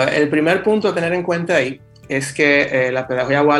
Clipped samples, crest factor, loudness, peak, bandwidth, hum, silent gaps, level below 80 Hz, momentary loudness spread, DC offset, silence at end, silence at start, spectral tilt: under 0.1%; 16 dB; -17 LUFS; -2 dBFS; 12.5 kHz; none; none; -54 dBFS; 8 LU; under 0.1%; 0 s; 0 s; -5 dB/octave